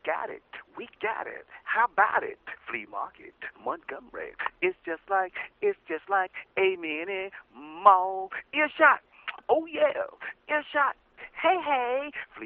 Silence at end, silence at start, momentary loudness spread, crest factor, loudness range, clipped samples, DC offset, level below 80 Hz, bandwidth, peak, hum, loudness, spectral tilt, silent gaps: 0 s; 0.05 s; 19 LU; 26 dB; 7 LU; under 0.1%; under 0.1%; -70 dBFS; 4.4 kHz; -4 dBFS; none; -27 LUFS; 0 dB/octave; none